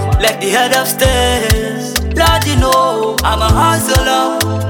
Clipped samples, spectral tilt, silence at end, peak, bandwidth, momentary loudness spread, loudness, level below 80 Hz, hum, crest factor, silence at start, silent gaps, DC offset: under 0.1%; -4 dB/octave; 0 s; 0 dBFS; 19 kHz; 4 LU; -12 LUFS; -20 dBFS; none; 12 dB; 0 s; none; under 0.1%